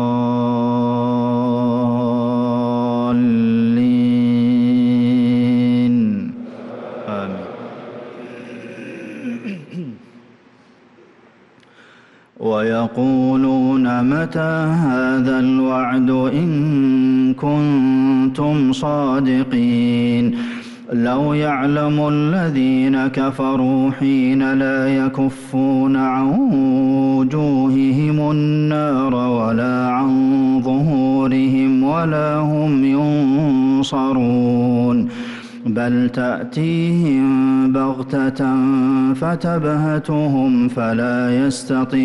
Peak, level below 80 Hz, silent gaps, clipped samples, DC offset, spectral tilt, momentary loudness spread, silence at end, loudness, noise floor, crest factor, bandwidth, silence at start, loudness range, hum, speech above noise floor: -8 dBFS; -52 dBFS; none; under 0.1%; under 0.1%; -8 dB/octave; 10 LU; 0 s; -17 LUFS; -49 dBFS; 8 dB; 11 kHz; 0 s; 10 LU; none; 34 dB